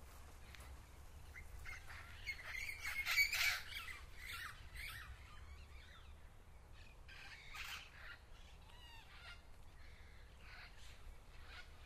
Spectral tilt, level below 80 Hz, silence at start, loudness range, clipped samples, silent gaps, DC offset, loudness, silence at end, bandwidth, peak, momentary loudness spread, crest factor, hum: -1 dB/octave; -58 dBFS; 0 s; 18 LU; under 0.1%; none; under 0.1%; -43 LUFS; 0 s; 15.5 kHz; -24 dBFS; 24 LU; 26 dB; none